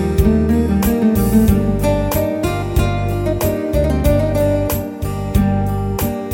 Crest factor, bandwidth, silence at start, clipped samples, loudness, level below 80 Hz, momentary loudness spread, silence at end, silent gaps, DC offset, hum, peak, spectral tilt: 14 dB; 17 kHz; 0 s; under 0.1%; -17 LUFS; -24 dBFS; 6 LU; 0 s; none; under 0.1%; none; -2 dBFS; -7 dB/octave